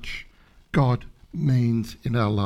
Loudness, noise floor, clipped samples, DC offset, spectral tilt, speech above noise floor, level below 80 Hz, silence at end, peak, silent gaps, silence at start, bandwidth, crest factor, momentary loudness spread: -24 LUFS; -53 dBFS; under 0.1%; under 0.1%; -8 dB/octave; 30 dB; -44 dBFS; 0 s; -8 dBFS; none; 0 s; 12 kHz; 16 dB; 14 LU